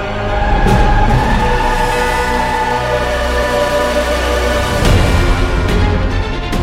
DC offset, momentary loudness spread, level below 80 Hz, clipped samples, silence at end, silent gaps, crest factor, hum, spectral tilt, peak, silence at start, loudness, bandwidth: under 0.1%; 3 LU; -16 dBFS; under 0.1%; 0 s; none; 12 dB; none; -5.5 dB/octave; 0 dBFS; 0 s; -14 LUFS; 15.5 kHz